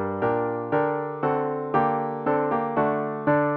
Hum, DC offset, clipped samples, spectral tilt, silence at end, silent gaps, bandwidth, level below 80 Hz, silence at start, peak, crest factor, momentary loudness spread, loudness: none; under 0.1%; under 0.1%; -10.5 dB/octave; 0 s; none; 4.5 kHz; -62 dBFS; 0 s; -8 dBFS; 16 dB; 3 LU; -25 LUFS